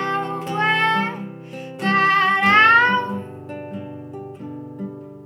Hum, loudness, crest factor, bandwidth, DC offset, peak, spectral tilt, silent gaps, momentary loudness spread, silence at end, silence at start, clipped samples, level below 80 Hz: none; -16 LUFS; 18 dB; 16 kHz; under 0.1%; -2 dBFS; -5 dB/octave; none; 22 LU; 0 s; 0 s; under 0.1%; -78 dBFS